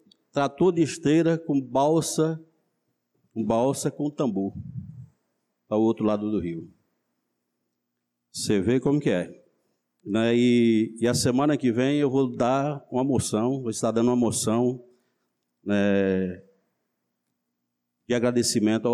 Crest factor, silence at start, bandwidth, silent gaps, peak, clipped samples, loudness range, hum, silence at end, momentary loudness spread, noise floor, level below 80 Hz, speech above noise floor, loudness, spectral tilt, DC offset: 14 dB; 0.35 s; 14 kHz; none; -12 dBFS; under 0.1%; 7 LU; 60 Hz at -55 dBFS; 0 s; 11 LU; -81 dBFS; -60 dBFS; 57 dB; -24 LUFS; -5.5 dB/octave; under 0.1%